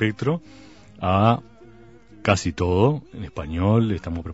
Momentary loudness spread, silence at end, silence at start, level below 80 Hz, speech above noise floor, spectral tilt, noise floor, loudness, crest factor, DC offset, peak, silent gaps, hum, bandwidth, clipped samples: 11 LU; 0 s; 0 s; -44 dBFS; 26 dB; -6.5 dB/octave; -48 dBFS; -22 LUFS; 22 dB; 0.2%; -2 dBFS; none; none; 8 kHz; under 0.1%